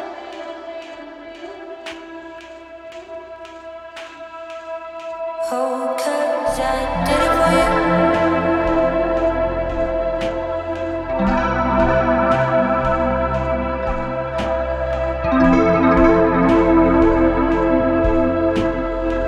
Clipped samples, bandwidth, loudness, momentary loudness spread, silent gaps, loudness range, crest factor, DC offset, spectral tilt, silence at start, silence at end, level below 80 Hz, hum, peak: under 0.1%; 13.5 kHz; -17 LUFS; 20 LU; none; 19 LU; 18 dB; under 0.1%; -6.5 dB/octave; 0 s; 0 s; -30 dBFS; none; -2 dBFS